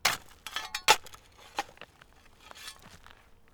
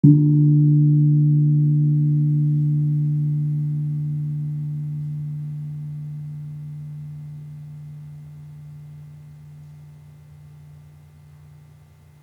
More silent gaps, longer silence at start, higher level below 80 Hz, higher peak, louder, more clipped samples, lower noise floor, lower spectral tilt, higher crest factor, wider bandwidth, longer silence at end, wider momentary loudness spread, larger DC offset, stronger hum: neither; about the same, 0.05 s vs 0.05 s; about the same, -62 dBFS vs -62 dBFS; about the same, -4 dBFS vs -2 dBFS; second, -30 LUFS vs -20 LUFS; neither; first, -58 dBFS vs -49 dBFS; second, 0.5 dB/octave vs -12.5 dB/octave; first, 30 dB vs 20 dB; first, over 20 kHz vs 1 kHz; second, 0.55 s vs 1.5 s; first, 27 LU vs 24 LU; neither; neither